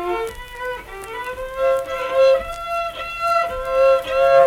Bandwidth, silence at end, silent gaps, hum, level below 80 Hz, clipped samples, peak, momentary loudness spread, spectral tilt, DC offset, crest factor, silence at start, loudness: 15.5 kHz; 0 s; none; none; -42 dBFS; under 0.1%; -2 dBFS; 14 LU; -3.5 dB/octave; under 0.1%; 16 dB; 0 s; -20 LUFS